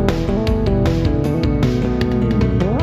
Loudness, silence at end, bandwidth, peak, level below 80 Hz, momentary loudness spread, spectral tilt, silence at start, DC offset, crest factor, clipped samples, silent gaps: -17 LUFS; 0 s; 14 kHz; -2 dBFS; -24 dBFS; 2 LU; -8 dB/octave; 0 s; under 0.1%; 14 dB; under 0.1%; none